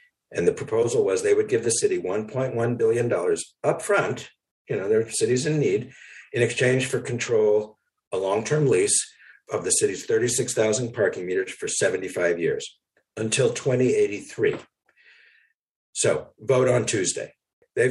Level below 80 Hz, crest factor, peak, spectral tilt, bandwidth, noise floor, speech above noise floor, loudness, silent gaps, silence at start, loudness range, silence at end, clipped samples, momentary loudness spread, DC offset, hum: -64 dBFS; 18 dB; -6 dBFS; -4 dB/octave; 12.5 kHz; -62 dBFS; 39 dB; -24 LUFS; 4.51-4.65 s, 8.07-8.11 s, 15.59-15.64 s, 15.71-15.93 s, 17.53-17.62 s; 0.3 s; 3 LU; 0 s; under 0.1%; 11 LU; under 0.1%; none